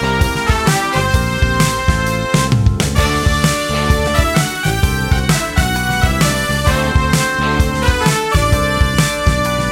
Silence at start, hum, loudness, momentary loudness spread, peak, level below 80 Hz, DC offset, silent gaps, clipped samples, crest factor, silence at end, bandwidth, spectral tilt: 0 s; none; -15 LUFS; 2 LU; 0 dBFS; -20 dBFS; under 0.1%; none; under 0.1%; 14 dB; 0 s; 17 kHz; -4.5 dB/octave